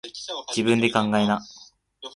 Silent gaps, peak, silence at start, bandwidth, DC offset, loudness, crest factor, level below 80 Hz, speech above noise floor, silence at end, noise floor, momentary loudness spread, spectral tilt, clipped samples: none; -4 dBFS; 0.05 s; 11.5 kHz; under 0.1%; -23 LUFS; 22 dB; -60 dBFS; 22 dB; 0.05 s; -44 dBFS; 17 LU; -4.5 dB/octave; under 0.1%